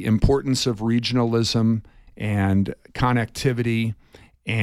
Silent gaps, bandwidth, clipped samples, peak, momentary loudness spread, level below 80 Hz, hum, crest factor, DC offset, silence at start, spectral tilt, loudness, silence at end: none; 13.5 kHz; under 0.1%; -4 dBFS; 8 LU; -36 dBFS; none; 18 dB; under 0.1%; 0 s; -6 dB/octave; -22 LUFS; 0 s